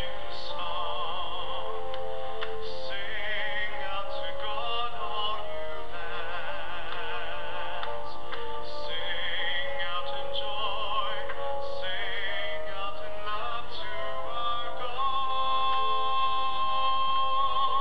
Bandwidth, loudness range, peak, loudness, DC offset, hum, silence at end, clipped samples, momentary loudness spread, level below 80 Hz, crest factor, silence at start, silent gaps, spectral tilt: 15 kHz; 6 LU; -14 dBFS; -32 LUFS; 7%; none; 0 s; under 0.1%; 10 LU; -54 dBFS; 14 dB; 0 s; none; -4 dB/octave